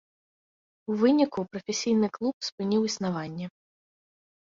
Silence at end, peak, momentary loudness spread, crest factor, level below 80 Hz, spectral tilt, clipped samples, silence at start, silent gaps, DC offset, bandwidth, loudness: 1 s; -10 dBFS; 14 LU; 18 dB; -70 dBFS; -5 dB/octave; under 0.1%; 0.9 s; 2.33-2.40 s, 2.52-2.58 s; under 0.1%; 7.6 kHz; -27 LUFS